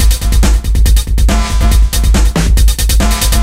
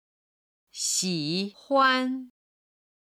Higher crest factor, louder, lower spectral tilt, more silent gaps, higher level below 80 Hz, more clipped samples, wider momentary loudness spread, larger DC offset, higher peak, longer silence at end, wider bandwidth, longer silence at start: second, 8 dB vs 18 dB; first, -12 LUFS vs -25 LUFS; first, -4.5 dB/octave vs -2.5 dB/octave; neither; first, -8 dBFS vs -76 dBFS; neither; second, 1 LU vs 12 LU; first, 0.8% vs under 0.1%; first, 0 dBFS vs -10 dBFS; second, 0 s vs 0.75 s; about the same, 16 kHz vs 16 kHz; second, 0 s vs 0.75 s